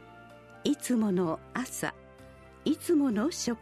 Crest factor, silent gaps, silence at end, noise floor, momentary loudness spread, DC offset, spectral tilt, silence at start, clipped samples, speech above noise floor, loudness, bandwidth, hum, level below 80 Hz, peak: 18 dB; none; 0 s; -52 dBFS; 9 LU; under 0.1%; -5 dB/octave; 0 s; under 0.1%; 23 dB; -30 LUFS; 13.5 kHz; none; -62 dBFS; -14 dBFS